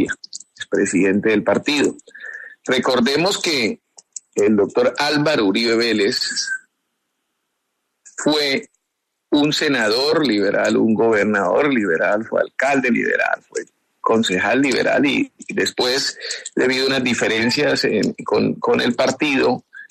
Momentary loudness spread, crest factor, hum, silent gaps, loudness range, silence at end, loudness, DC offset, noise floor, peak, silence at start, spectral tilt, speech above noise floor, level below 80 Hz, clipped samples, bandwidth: 9 LU; 16 dB; none; none; 4 LU; 0.05 s; -18 LUFS; under 0.1%; -76 dBFS; -4 dBFS; 0 s; -4 dB/octave; 58 dB; -60 dBFS; under 0.1%; 13.5 kHz